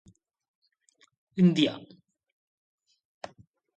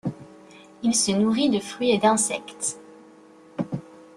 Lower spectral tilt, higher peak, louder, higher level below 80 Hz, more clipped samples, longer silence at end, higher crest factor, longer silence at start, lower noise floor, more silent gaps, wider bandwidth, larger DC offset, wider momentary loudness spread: first, -7 dB/octave vs -3.5 dB/octave; second, -10 dBFS vs -6 dBFS; about the same, -25 LUFS vs -23 LUFS; second, -74 dBFS vs -64 dBFS; neither; first, 1.9 s vs 0.2 s; about the same, 22 dB vs 18 dB; first, 1.35 s vs 0.05 s; first, -67 dBFS vs -50 dBFS; neither; second, 8.4 kHz vs 13 kHz; neither; first, 24 LU vs 16 LU